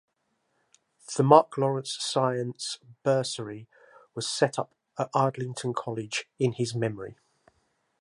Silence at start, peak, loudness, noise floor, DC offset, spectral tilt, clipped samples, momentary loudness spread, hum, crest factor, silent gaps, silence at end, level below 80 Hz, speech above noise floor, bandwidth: 1.1 s; -2 dBFS; -27 LUFS; -75 dBFS; under 0.1%; -5 dB/octave; under 0.1%; 16 LU; none; 26 dB; none; 0.9 s; -72 dBFS; 49 dB; 11.5 kHz